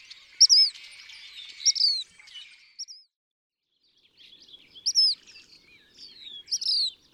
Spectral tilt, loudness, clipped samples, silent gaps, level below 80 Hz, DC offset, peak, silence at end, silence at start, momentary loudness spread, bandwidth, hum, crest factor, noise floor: 5 dB/octave; -21 LUFS; under 0.1%; 3.16-3.50 s; -78 dBFS; under 0.1%; -8 dBFS; 0.25 s; 0.1 s; 27 LU; 13 kHz; none; 20 dB; -70 dBFS